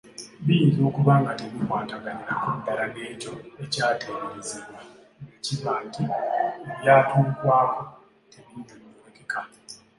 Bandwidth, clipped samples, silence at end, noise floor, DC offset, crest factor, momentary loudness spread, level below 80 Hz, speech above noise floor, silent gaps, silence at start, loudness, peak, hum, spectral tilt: 11.5 kHz; under 0.1%; 0.25 s; -48 dBFS; under 0.1%; 22 dB; 22 LU; -64 dBFS; 24 dB; none; 0.05 s; -24 LUFS; -4 dBFS; none; -6 dB/octave